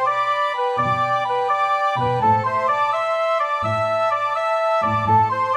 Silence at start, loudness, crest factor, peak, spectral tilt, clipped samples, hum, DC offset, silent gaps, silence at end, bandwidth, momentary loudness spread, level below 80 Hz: 0 s; -19 LUFS; 14 dB; -6 dBFS; -6 dB/octave; under 0.1%; none; under 0.1%; none; 0 s; 12.5 kHz; 3 LU; -56 dBFS